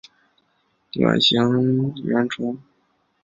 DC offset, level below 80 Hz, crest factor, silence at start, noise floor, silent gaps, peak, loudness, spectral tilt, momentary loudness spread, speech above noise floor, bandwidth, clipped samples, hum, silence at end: under 0.1%; -62 dBFS; 22 dB; 0.95 s; -67 dBFS; none; 0 dBFS; -20 LUFS; -6 dB/octave; 13 LU; 47 dB; 7.6 kHz; under 0.1%; none; 0.65 s